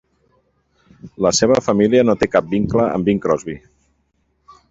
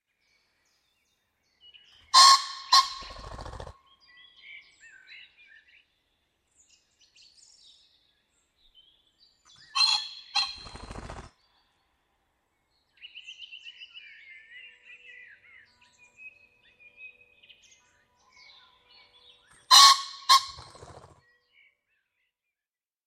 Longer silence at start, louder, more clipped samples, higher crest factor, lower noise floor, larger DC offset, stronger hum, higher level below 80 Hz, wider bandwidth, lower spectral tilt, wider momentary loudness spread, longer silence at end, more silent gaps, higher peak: second, 1.05 s vs 2.15 s; first, -16 LUFS vs -20 LUFS; neither; second, 18 dB vs 28 dB; second, -65 dBFS vs under -90 dBFS; neither; neither; first, -46 dBFS vs -60 dBFS; second, 8.2 kHz vs 15 kHz; first, -5 dB/octave vs 2 dB/octave; second, 7 LU vs 31 LU; second, 1.1 s vs 2.55 s; neither; about the same, 0 dBFS vs -2 dBFS